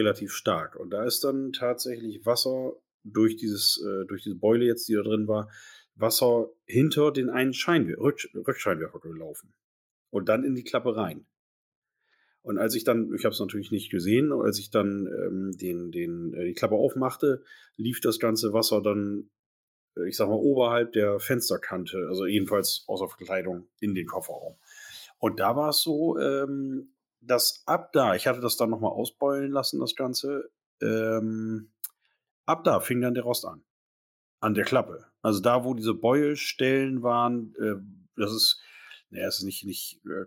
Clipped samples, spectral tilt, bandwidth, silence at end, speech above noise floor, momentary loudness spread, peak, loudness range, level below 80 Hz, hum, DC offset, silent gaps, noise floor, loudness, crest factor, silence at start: under 0.1%; -4.5 dB/octave; 17 kHz; 0 s; 44 dB; 11 LU; -10 dBFS; 4 LU; -74 dBFS; none; under 0.1%; 2.94-3.00 s, 9.64-10.06 s, 11.39-11.82 s, 19.39-19.88 s, 30.66-30.78 s, 32.31-32.44 s, 33.70-34.38 s; -71 dBFS; -27 LUFS; 16 dB; 0 s